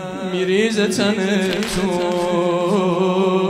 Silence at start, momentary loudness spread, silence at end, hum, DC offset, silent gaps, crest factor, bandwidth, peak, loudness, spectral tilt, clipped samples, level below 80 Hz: 0 s; 3 LU; 0 s; none; under 0.1%; none; 14 dB; 15.5 kHz; -4 dBFS; -18 LUFS; -5 dB/octave; under 0.1%; -46 dBFS